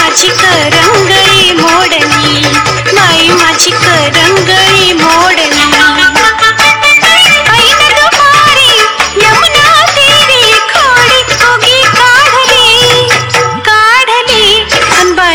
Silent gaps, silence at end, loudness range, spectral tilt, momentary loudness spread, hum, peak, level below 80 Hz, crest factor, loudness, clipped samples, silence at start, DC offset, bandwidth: none; 0 s; 2 LU; -2 dB/octave; 4 LU; none; 0 dBFS; -34 dBFS; 6 dB; -4 LUFS; 0.5%; 0 s; 0.5%; over 20 kHz